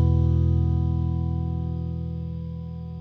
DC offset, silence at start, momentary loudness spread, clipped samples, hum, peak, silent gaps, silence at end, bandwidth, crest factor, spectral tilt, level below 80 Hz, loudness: under 0.1%; 0 s; 12 LU; under 0.1%; none; -12 dBFS; none; 0 s; 3.9 kHz; 12 dB; -11.5 dB/octave; -36 dBFS; -26 LUFS